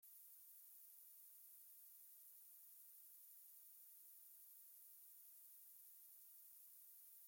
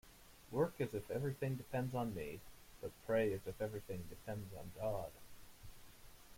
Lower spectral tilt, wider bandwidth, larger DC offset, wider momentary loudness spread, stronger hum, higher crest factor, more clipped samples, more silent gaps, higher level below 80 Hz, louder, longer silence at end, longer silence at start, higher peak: second, 3 dB/octave vs -7 dB/octave; about the same, 17 kHz vs 16.5 kHz; neither; second, 0 LU vs 22 LU; neither; second, 14 dB vs 20 dB; neither; neither; second, under -90 dBFS vs -64 dBFS; second, -61 LUFS vs -43 LUFS; about the same, 0 s vs 0 s; about the same, 0 s vs 0.05 s; second, -50 dBFS vs -24 dBFS